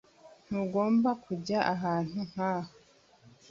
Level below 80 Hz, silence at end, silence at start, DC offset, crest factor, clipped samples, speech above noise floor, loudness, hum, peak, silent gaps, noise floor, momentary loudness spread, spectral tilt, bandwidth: -68 dBFS; 0.85 s; 0.25 s; under 0.1%; 20 dB; under 0.1%; 31 dB; -31 LUFS; none; -12 dBFS; none; -61 dBFS; 10 LU; -7 dB/octave; 7.4 kHz